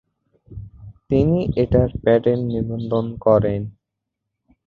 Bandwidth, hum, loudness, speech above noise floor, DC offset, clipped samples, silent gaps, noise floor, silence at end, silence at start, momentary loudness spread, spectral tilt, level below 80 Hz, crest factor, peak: 4.9 kHz; none; -19 LUFS; 62 dB; under 0.1%; under 0.1%; none; -80 dBFS; 0.95 s; 0.5 s; 17 LU; -10.5 dB/octave; -38 dBFS; 18 dB; -2 dBFS